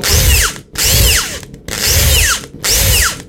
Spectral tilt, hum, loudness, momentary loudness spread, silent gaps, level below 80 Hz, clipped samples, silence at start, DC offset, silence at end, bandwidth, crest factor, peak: -1.5 dB/octave; none; -11 LUFS; 8 LU; none; -18 dBFS; under 0.1%; 0 s; under 0.1%; 0 s; 17 kHz; 12 dB; 0 dBFS